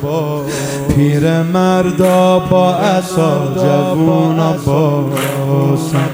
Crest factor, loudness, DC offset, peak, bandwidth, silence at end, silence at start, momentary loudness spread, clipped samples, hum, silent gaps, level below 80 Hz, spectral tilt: 12 dB; -13 LUFS; under 0.1%; 0 dBFS; 16 kHz; 0 s; 0 s; 6 LU; under 0.1%; none; none; -40 dBFS; -6.5 dB/octave